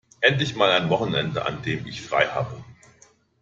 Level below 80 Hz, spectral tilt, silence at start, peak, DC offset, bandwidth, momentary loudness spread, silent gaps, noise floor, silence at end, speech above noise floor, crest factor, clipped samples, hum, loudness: -58 dBFS; -5 dB/octave; 0.2 s; -4 dBFS; under 0.1%; 7.8 kHz; 10 LU; none; -57 dBFS; 0.7 s; 34 dB; 20 dB; under 0.1%; none; -23 LUFS